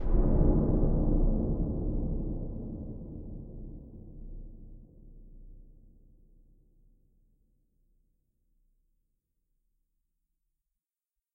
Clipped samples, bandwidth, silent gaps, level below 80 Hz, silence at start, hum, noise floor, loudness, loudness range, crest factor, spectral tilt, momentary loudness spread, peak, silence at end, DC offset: under 0.1%; 1.7 kHz; none; -34 dBFS; 0 s; none; under -90 dBFS; -32 LUFS; 24 LU; 20 dB; -14 dB/octave; 23 LU; -12 dBFS; 5.7 s; under 0.1%